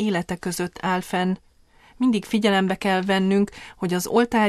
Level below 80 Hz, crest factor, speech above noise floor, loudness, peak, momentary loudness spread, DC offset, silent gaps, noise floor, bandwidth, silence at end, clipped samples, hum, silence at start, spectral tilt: -54 dBFS; 16 dB; 32 dB; -23 LUFS; -6 dBFS; 8 LU; under 0.1%; none; -53 dBFS; 14.5 kHz; 0 s; under 0.1%; none; 0 s; -5.5 dB/octave